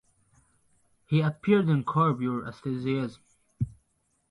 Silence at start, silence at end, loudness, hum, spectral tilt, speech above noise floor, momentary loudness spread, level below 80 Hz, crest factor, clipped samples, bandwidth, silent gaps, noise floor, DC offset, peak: 1.1 s; 0.6 s; -28 LUFS; none; -9 dB/octave; 47 dB; 12 LU; -58 dBFS; 18 dB; under 0.1%; 10.5 kHz; none; -73 dBFS; under 0.1%; -10 dBFS